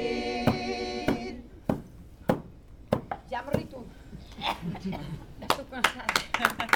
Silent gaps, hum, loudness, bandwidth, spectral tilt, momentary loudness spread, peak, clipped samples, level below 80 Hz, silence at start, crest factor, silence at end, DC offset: none; none; -31 LUFS; 19.5 kHz; -4.5 dB/octave; 15 LU; -2 dBFS; under 0.1%; -48 dBFS; 0 s; 28 dB; 0 s; under 0.1%